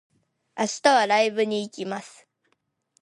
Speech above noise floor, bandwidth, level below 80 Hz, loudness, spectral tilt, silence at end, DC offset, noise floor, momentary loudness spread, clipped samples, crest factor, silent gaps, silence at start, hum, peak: 50 dB; 11.5 kHz; -78 dBFS; -23 LUFS; -3 dB/octave; 0.95 s; under 0.1%; -73 dBFS; 15 LU; under 0.1%; 22 dB; none; 0.55 s; none; -4 dBFS